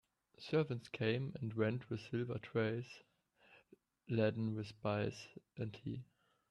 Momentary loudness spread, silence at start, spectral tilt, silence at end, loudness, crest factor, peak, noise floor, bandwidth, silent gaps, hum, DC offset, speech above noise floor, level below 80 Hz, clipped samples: 13 LU; 0.4 s; -7.5 dB/octave; 0.45 s; -41 LUFS; 18 dB; -22 dBFS; -70 dBFS; 10.5 kHz; none; none; under 0.1%; 30 dB; -74 dBFS; under 0.1%